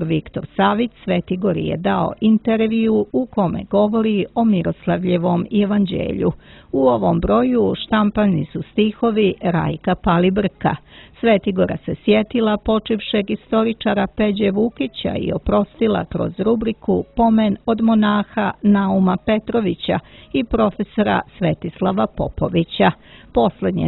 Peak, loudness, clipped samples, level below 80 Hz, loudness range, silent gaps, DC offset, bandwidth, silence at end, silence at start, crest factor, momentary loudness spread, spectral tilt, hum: -2 dBFS; -18 LUFS; under 0.1%; -40 dBFS; 2 LU; none; under 0.1%; 4.2 kHz; 0 s; 0 s; 16 dB; 6 LU; -11.5 dB/octave; none